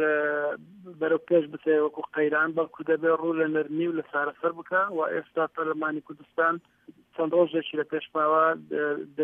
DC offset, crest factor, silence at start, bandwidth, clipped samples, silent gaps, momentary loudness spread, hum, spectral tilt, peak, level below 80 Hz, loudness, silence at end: under 0.1%; 16 dB; 0 s; 3.7 kHz; under 0.1%; none; 8 LU; none; -8.5 dB/octave; -10 dBFS; -78 dBFS; -27 LUFS; 0 s